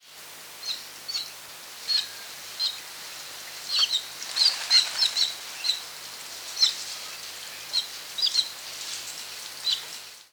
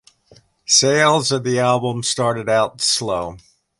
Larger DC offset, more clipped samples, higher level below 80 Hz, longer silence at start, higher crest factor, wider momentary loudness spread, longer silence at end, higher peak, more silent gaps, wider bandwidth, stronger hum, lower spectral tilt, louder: neither; neither; second, -78 dBFS vs -54 dBFS; second, 0.05 s vs 0.7 s; about the same, 22 dB vs 18 dB; first, 16 LU vs 10 LU; second, 0.05 s vs 0.4 s; second, -8 dBFS vs -2 dBFS; neither; first, over 20 kHz vs 11.5 kHz; neither; second, 2.5 dB/octave vs -3 dB/octave; second, -26 LUFS vs -17 LUFS